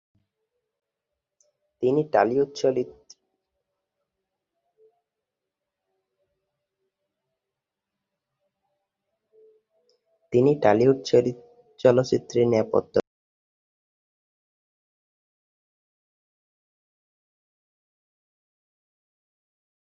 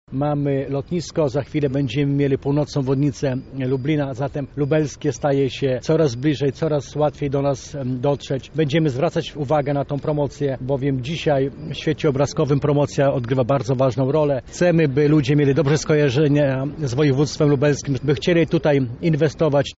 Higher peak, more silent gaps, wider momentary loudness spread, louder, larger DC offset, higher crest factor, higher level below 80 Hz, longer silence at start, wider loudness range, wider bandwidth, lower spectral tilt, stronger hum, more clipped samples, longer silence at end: first, -4 dBFS vs -8 dBFS; neither; about the same, 8 LU vs 7 LU; about the same, -22 LUFS vs -20 LUFS; neither; first, 24 dB vs 12 dB; second, -66 dBFS vs -46 dBFS; first, 1.8 s vs 0.1 s; first, 10 LU vs 4 LU; about the same, 7.6 kHz vs 8 kHz; about the same, -7 dB/octave vs -6.5 dB/octave; neither; neither; first, 7 s vs 0.05 s